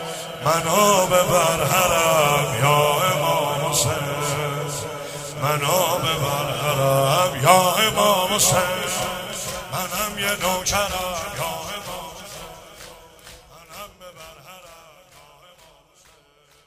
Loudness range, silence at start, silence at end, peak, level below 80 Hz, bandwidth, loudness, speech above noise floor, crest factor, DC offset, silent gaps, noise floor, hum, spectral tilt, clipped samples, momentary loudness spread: 14 LU; 0 s; 1.9 s; 0 dBFS; -48 dBFS; 16 kHz; -20 LUFS; 37 dB; 22 dB; under 0.1%; none; -56 dBFS; none; -3 dB/octave; under 0.1%; 18 LU